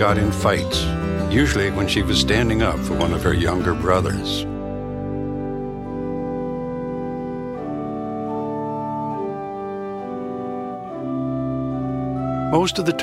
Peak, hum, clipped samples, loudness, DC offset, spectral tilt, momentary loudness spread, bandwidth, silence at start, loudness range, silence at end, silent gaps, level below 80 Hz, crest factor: -4 dBFS; none; under 0.1%; -23 LUFS; under 0.1%; -5.5 dB/octave; 10 LU; 15.5 kHz; 0 s; 8 LU; 0 s; none; -36 dBFS; 18 dB